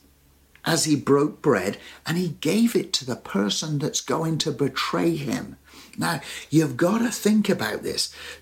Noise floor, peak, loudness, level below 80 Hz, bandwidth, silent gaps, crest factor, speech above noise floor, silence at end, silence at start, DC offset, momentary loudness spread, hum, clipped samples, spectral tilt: -57 dBFS; -6 dBFS; -24 LUFS; -58 dBFS; 17 kHz; none; 18 dB; 34 dB; 0.05 s; 0.65 s; under 0.1%; 8 LU; none; under 0.1%; -4.5 dB/octave